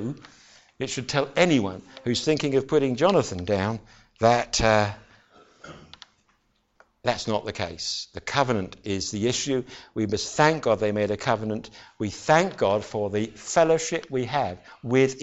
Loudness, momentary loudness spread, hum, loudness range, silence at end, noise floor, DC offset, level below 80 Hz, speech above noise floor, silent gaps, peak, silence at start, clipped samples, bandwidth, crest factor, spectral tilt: -25 LUFS; 12 LU; none; 6 LU; 0 s; -68 dBFS; under 0.1%; -50 dBFS; 44 dB; none; -6 dBFS; 0 s; under 0.1%; 8.2 kHz; 20 dB; -4.5 dB/octave